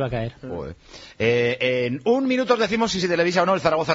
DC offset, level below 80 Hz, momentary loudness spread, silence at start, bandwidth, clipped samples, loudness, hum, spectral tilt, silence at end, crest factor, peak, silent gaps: under 0.1%; -50 dBFS; 14 LU; 0 s; 7.8 kHz; under 0.1%; -21 LUFS; none; -4 dB/octave; 0 s; 16 dB; -4 dBFS; none